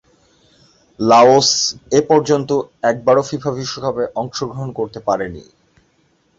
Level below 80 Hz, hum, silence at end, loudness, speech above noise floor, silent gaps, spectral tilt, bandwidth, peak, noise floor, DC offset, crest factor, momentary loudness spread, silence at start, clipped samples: -52 dBFS; none; 0.95 s; -16 LUFS; 44 dB; none; -4 dB/octave; 8 kHz; 0 dBFS; -59 dBFS; under 0.1%; 16 dB; 14 LU; 1 s; under 0.1%